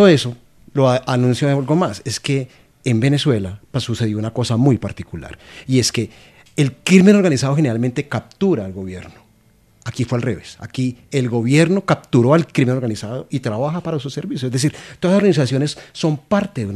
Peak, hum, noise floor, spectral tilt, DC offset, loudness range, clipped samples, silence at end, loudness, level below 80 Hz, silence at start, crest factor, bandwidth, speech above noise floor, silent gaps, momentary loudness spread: 0 dBFS; none; -54 dBFS; -6 dB/octave; under 0.1%; 5 LU; under 0.1%; 0 s; -18 LUFS; -52 dBFS; 0 s; 18 dB; 13.5 kHz; 37 dB; none; 14 LU